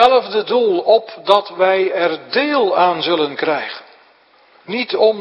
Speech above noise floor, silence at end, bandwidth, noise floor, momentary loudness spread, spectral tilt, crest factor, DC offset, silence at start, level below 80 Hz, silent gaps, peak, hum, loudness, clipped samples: 36 dB; 0 s; 9.6 kHz; -51 dBFS; 8 LU; -5.5 dB/octave; 16 dB; under 0.1%; 0 s; -62 dBFS; none; 0 dBFS; none; -16 LUFS; under 0.1%